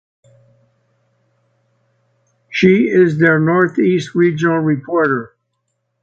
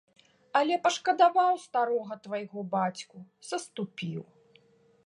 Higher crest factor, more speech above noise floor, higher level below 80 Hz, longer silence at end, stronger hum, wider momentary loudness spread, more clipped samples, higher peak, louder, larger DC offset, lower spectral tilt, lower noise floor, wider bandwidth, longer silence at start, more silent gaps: about the same, 16 dB vs 20 dB; first, 57 dB vs 34 dB; first, -58 dBFS vs -82 dBFS; about the same, 0.75 s vs 0.85 s; neither; second, 5 LU vs 15 LU; neither; first, 0 dBFS vs -10 dBFS; first, -14 LUFS vs -29 LUFS; neither; first, -7.5 dB/octave vs -4.5 dB/octave; first, -70 dBFS vs -63 dBFS; second, 7.6 kHz vs 11 kHz; first, 2.5 s vs 0.55 s; neither